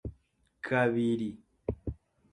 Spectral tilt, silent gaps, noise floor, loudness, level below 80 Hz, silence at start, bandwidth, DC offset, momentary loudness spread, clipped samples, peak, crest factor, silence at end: -7.5 dB/octave; none; -70 dBFS; -32 LUFS; -50 dBFS; 0.05 s; 9.6 kHz; under 0.1%; 17 LU; under 0.1%; -14 dBFS; 20 dB; 0.35 s